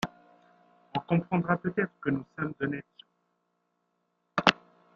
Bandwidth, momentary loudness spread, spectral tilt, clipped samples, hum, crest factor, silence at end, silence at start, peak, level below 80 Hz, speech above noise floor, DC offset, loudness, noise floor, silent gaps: 7.8 kHz; 12 LU; -6 dB/octave; under 0.1%; none; 30 dB; 0.4 s; 0 s; -2 dBFS; -66 dBFS; 47 dB; under 0.1%; -30 LUFS; -77 dBFS; none